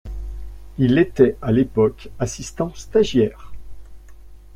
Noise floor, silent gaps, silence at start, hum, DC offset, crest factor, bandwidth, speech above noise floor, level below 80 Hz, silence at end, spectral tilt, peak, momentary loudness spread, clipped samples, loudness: -40 dBFS; none; 0.05 s; none; under 0.1%; 18 dB; 13.5 kHz; 22 dB; -38 dBFS; 0 s; -6.5 dB/octave; -2 dBFS; 18 LU; under 0.1%; -20 LUFS